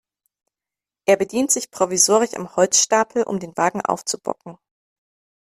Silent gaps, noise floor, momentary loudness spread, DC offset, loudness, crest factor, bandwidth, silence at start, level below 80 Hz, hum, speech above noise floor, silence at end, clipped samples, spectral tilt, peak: none; -89 dBFS; 10 LU; under 0.1%; -19 LUFS; 20 dB; 15 kHz; 1.1 s; -66 dBFS; none; 69 dB; 1 s; under 0.1%; -2.5 dB/octave; -2 dBFS